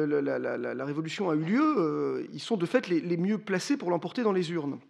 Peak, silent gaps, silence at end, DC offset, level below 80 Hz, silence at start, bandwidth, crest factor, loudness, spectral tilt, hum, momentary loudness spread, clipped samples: -10 dBFS; none; 0.1 s; under 0.1%; -86 dBFS; 0 s; 12 kHz; 18 dB; -29 LUFS; -6 dB/octave; none; 7 LU; under 0.1%